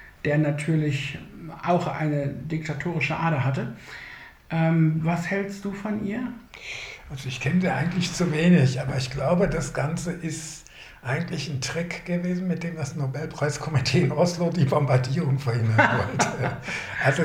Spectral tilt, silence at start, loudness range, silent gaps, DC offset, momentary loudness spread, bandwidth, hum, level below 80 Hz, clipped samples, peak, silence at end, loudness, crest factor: -6 dB/octave; 0 s; 5 LU; none; under 0.1%; 14 LU; 13 kHz; none; -50 dBFS; under 0.1%; -4 dBFS; 0 s; -25 LUFS; 22 dB